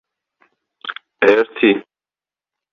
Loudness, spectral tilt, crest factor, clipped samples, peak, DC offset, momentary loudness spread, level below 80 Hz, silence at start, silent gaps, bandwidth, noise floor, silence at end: -15 LUFS; -6 dB/octave; 18 dB; under 0.1%; -2 dBFS; under 0.1%; 16 LU; -62 dBFS; 0.85 s; none; 6.8 kHz; under -90 dBFS; 0.9 s